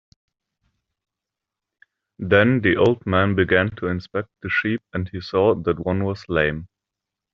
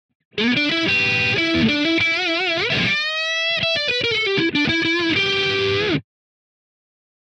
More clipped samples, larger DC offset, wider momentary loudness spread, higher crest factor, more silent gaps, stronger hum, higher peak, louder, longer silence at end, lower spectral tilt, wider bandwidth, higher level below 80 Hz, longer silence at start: neither; neither; first, 11 LU vs 3 LU; first, 20 dB vs 14 dB; neither; neither; first, -2 dBFS vs -6 dBFS; second, -21 LUFS vs -18 LUFS; second, 0.7 s vs 1.35 s; about the same, -5 dB/octave vs -4 dB/octave; second, 7 kHz vs 8.8 kHz; about the same, -52 dBFS vs -54 dBFS; first, 2.2 s vs 0.35 s